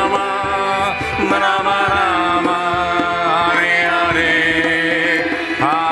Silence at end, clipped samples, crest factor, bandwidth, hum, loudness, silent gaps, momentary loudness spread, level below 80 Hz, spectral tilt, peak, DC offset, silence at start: 0 s; under 0.1%; 14 dB; 12.5 kHz; none; -15 LUFS; none; 5 LU; -44 dBFS; -4 dB/octave; -2 dBFS; under 0.1%; 0 s